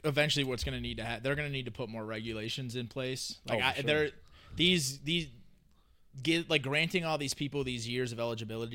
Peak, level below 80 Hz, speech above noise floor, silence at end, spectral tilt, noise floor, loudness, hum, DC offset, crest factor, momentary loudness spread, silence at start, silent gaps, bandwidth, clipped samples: -12 dBFS; -54 dBFS; 30 dB; 0 s; -4 dB/octave; -64 dBFS; -33 LUFS; none; under 0.1%; 22 dB; 10 LU; 0.05 s; none; 16.5 kHz; under 0.1%